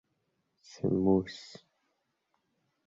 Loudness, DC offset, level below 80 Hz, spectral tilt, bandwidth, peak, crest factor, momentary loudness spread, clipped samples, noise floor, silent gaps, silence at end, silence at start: -30 LUFS; under 0.1%; -60 dBFS; -7.5 dB/octave; 7.8 kHz; -14 dBFS; 20 dB; 20 LU; under 0.1%; -79 dBFS; none; 1.4 s; 0.85 s